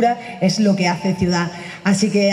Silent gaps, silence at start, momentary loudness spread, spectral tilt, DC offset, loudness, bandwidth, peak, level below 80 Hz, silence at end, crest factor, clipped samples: none; 0 s; 5 LU; -5.5 dB/octave; under 0.1%; -18 LUFS; 11.5 kHz; -4 dBFS; -50 dBFS; 0 s; 14 dB; under 0.1%